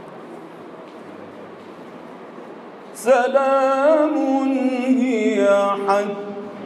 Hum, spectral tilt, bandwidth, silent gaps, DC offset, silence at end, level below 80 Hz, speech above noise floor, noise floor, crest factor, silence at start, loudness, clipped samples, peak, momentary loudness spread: none; -5 dB/octave; 12.5 kHz; none; under 0.1%; 0 s; -76 dBFS; 21 dB; -38 dBFS; 18 dB; 0 s; -18 LUFS; under 0.1%; -4 dBFS; 22 LU